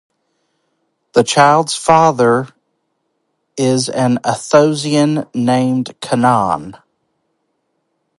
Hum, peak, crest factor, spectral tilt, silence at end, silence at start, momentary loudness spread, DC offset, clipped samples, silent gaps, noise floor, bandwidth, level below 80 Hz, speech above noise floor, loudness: none; 0 dBFS; 16 dB; -5 dB/octave; 1.5 s; 1.15 s; 9 LU; under 0.1%; under 0.1%; none; -68 dBFS; 11.5 kHz; -56 dBFS; 55 dB; -14 LUFS